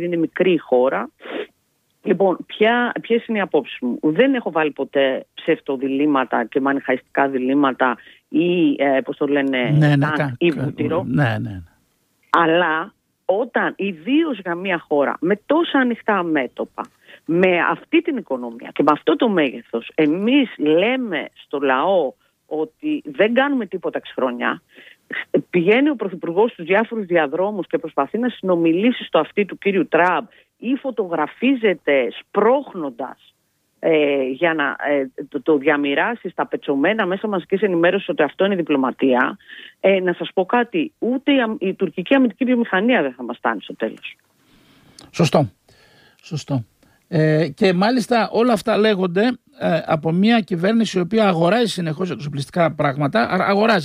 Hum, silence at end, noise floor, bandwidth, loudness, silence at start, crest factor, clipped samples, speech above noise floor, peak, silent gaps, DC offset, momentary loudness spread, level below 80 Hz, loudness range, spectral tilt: none; 0 s; -66 dBFS; 12.5 kHz; -19 LUFS; 0 s; 18 dB; under 0.1%; 48 dB; -2 dBFS; none; under 0.1%; 10 LU; -62 dBFS; 3 LU; -6.5 dB/octave